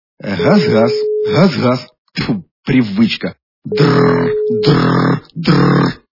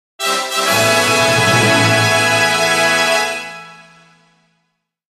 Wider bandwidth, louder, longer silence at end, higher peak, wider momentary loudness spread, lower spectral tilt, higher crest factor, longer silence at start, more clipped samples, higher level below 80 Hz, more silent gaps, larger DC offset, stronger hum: second, 5.8 kHz vs 15.5 kHz; about the same, -13 LUFS vs -12 LUFS; second, 0.15 s vs 1.45 s; about the same, 0 dBFS vs 0 dBFS; first, 11 LU vs 8 LU; first, -7.5 dB/octave vs -2.5 dB/octave; about the same, 14 dB vs 14 dB; about the same, 0.25 s vs 0.2 s; neither; first, -44 dBFS vs -54 dBFS; first, 1.98-2.05 s, 2.51-2.63 s, 3.43-3.62 s vs none; neither; neither